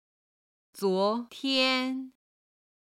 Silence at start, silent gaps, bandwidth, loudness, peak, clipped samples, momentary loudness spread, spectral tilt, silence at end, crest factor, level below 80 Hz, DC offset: 0.75 s; none; 15 kHz; -28 LUFS; -14 dBFS; under 0.1%; 12 LU; -4 dB/octave; 0.75 s; 18 dB; -82 dBFS; under 0.1%